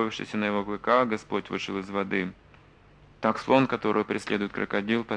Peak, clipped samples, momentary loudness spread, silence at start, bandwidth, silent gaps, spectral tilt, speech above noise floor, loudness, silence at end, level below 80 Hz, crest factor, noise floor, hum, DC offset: -6 dBFS; under 0.1%; 8 LU; 0 s; 10 kHz; none; -6 dB/octave; 28 dB; -27 LUFS; 0 s; -60 dBFS; 20 dB; -55 dBFS; none; under 0.1%